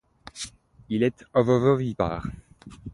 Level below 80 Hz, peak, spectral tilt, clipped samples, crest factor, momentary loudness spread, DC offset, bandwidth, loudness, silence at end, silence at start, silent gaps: -48 dBFS; -6 dBFS; -7 dB/octave; under 0.1%; 20 dB; 21 LU; under 0.1%; 11.5 kHz; -24 LUFS; 0 s; 0.35 s; none